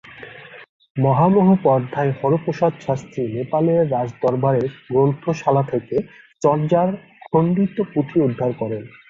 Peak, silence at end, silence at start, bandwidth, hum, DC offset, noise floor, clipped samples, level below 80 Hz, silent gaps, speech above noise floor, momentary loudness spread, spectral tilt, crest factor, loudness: -2 dBFS; 0.2 s; 0.05 s; 7.6 kHz; none; under 0.1%; -39 dBFS; under 0.1%; -56 dBFS; 0.69-0.80 s, 0.90-0.95 s; 21 dB; 11 LU; -9 dB/octave; 16 dB; -19 LUFS